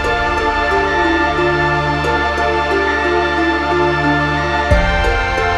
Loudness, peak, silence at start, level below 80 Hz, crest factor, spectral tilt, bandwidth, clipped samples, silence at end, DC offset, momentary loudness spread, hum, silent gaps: -15 LUFS; 0 dBFS; 0 s; -24 dBFS; 14 dB; -5.5 dB/octave; 12 kHz; under 0.1%; 0 s; under 0.1%; 2 LU; none; none